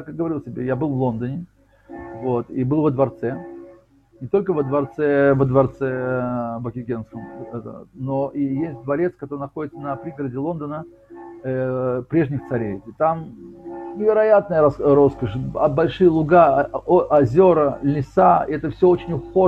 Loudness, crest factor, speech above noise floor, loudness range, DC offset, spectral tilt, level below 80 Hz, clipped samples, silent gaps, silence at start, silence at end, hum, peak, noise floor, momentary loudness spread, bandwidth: -20 LUFS; 18 dB; 32 dB; 10 LU; under 0.1%; -10 dB/octave; -48 dBFS; under 0.1%; none; 0 s; 0 s; none; -2 dBFS; -51 dBFS; 18 LU; 5.6 kHz